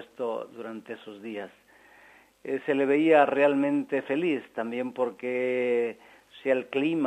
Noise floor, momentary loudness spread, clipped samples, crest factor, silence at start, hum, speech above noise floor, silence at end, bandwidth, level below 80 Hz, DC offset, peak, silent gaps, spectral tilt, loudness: -56 dBFS; 19 LU; under 0.1%; 20 dB; 0 s; none; 30 dB; 0 s; 9.2 kHz; -78 dBFS; under 0.1%; -8 dBFS; none; -6.5 dB/octave; -27 LUFS